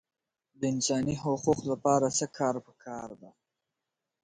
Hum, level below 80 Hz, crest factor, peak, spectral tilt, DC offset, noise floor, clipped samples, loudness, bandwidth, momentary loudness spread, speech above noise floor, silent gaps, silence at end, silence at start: none; -64 dBFS; 20 dB; -12 dBFS; -4.5 dB/octave; under 0.1%; -87 dBFS; under 0.1%; -29 LUFS; 9.6 kHz; 15 LU; 57 dB; none; 0.95 s; 0.6 s